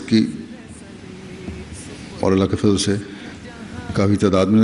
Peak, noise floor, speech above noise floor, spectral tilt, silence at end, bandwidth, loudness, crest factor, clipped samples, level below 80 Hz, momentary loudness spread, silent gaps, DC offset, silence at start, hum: -4 dBFS; -38 dBFS; 21 dB; -6 dB/octave; 0 s; 11 kHz; -19 LUFS; 16 dB; under 0.1%; -44 dBFS; 20 LU; none; under 0.1%; 0 s; none